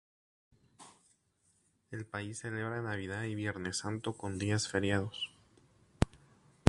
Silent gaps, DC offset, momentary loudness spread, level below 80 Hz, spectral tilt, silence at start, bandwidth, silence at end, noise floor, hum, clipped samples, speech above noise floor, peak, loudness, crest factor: none; under 0.1%; 15 LU; -54 dBFS; -4.5 dB/octave; 0.8 s; 11.5 kHz; 0 s; -74 dBFS; none; under 0.1%; 38 dB; -4 dBFS; -37 LUFS; 34 dB